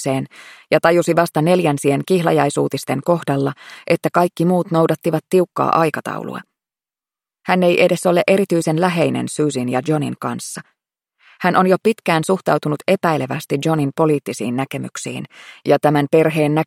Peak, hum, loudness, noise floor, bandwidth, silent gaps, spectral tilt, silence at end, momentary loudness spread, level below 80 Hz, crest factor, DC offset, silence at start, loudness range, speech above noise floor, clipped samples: 0 dBFS; none; -17 LUFS; under -90 dBFS; 16.5 kHz; none; -6 dB/octave; 0 s; 12 LU; -62 dBFS; 18 dB; under 0.1%; 0 s; 3 LU; over 73 dB; under 0.1%